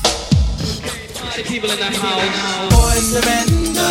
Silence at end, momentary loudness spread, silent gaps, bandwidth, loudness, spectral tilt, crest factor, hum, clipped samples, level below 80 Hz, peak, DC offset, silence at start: 0 s; 10 LU; none; 16.5 kHz; -17 LUFS; -3.5 dB/octave; 16 dB; none; under 0.1%; -22 dBFS; 0 dBFS; under 0.1%; 0 s